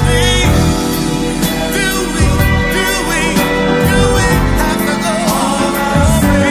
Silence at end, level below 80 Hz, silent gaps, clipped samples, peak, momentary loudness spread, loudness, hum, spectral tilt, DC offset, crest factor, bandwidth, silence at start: 0 s; -20 dBFS; none; under 0.1%; 0 dBFS; 4 LU; -12 LUFS; none; -4.5 dB/octave; under 0.1%; 12 dB; 16 kHz; 0 s